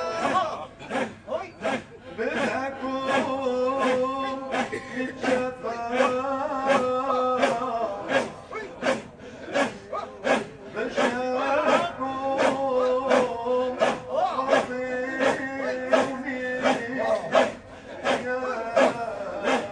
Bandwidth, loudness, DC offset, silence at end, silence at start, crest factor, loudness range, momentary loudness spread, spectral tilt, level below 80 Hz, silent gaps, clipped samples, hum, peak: 10 kHz; -26 LUFS; under 0.1%; 0 s; 0 s; 20 dB; 4 LU; 9 LU; -4 dB/octave; -60 dBFS; none; under 0.1%; none; -6 dBFS